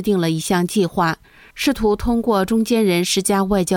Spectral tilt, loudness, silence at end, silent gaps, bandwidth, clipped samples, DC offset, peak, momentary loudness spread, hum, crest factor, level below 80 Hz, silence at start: -5 dB/octave; -18 LUFS; 0 s; none; 18 kHz; under 0.1%; under 0.1%; -6 dBFS; 4 LU; none; 12 dB; -38 dBFS; 0 s